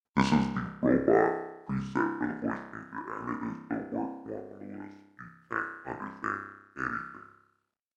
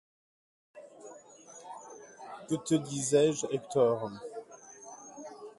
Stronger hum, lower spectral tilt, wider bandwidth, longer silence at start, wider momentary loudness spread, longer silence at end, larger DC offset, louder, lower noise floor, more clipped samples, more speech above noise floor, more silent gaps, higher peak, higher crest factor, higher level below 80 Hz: neither; first, -7 dB/octave vs -5 dB/octave; second, 9.6 kHz vs 11.5 kHz; second, 0.15 s vs 0.75 s; second, 19 LU vs 24 LU; first, 0.7 s vs 0.1 s; neither; about the same, -32 LUFS vs -30 LUFS; first, -75 dBFS vs -53 dBFS; neither; first, 44 dB vs 24 dB; neither; first, -8 dBFS vs -14 dBFS; about the same, 24 dB vs 20 dB; first, -58 dBFS vs -76 dBFS